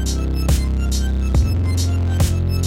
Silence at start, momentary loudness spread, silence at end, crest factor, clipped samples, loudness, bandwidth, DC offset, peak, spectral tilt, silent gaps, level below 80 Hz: 0 s; 2 LU; 0 s; 12 dB; under 0.1%; -19 LUFS; 16 kHz; under 0.1%; -6 dBFS; -5.5 dB/octave; none; -20 dBFS